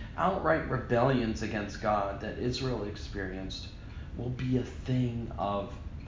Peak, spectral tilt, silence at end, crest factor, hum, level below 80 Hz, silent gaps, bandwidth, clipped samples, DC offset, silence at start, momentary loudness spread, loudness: -12 dBFS; -6.5 dB/octave; 0 s; 20 dB; none; -44 dBFS; none; 7.6 kHz; under 0.1%; under 0.1%; 0 s; 12 LU; -32 LUFS